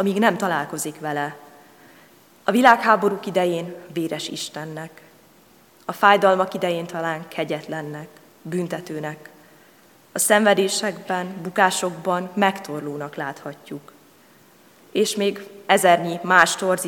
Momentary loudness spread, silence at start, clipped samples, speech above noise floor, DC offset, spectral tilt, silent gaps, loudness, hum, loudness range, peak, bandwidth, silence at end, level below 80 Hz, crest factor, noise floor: 18 LU; 0 s; under 0.1%; 32 dB; under 0.1%; -3.5 dB/octave; none; -21 LUFS; none; 7 LU; 0 dBFS; 18 kHz; 0 s; -74 dBFS; 22 dB; -53 dBFS